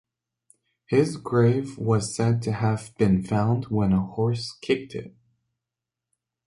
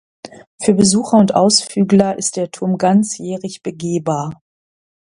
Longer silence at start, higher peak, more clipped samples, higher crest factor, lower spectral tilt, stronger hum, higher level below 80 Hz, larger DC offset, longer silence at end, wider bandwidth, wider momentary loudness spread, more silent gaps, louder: first, 0.9 s vs 0.25 s; second, -6 dBFS vs 0 dBFS; neither; about the same, 18 dB vs 16 dB; first, -7 dB/octave vs -5 dB/octave; neither; about the same, -50 dBFS vs -54 dBFS; neither; first, 1.4 s vs 0.75 s; about the same, 11.5 kHz vs 11 kHz; second, 5 LU vs 13 LU; second, none vs 0.47-0.58 s; second, -24 LUFS vs -15 LUFS